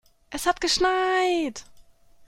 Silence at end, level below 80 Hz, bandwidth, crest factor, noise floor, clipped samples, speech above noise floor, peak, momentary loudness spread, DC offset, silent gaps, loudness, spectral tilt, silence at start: 0.45 s; -50 dBFS; 16 kHz; 18 dB; -52 dBFS; under 0.1%; 29 dB; -8 dBFS; 13 LU; under 0.1%; none; -23 LUFS; -1.5 dB/octave; 0.3 s